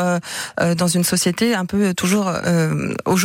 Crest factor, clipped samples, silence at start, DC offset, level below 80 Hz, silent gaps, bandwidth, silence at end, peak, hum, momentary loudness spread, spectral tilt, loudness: 14 dB; under 0.1%; 0 s; under 0.1%; -52 dBFS; none; 16.5 kHz; 0 s; -4 dBFS; none; 4 LU; -4.5 dB/octave; -19 LUFS